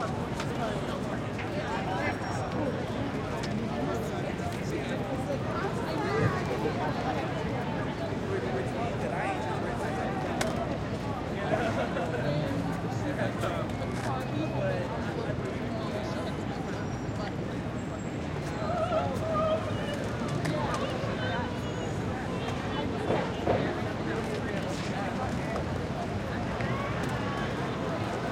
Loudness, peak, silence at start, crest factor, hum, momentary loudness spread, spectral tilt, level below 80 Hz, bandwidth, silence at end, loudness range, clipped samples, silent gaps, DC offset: -32 LUFS; -12 dBFS; 0 s; 18 dB; none; 4 LU; -6.5 dB/octave; -48 dBFS; 16 kHz; 0 s; 2 LU; under 0.1%; none; under 0.1%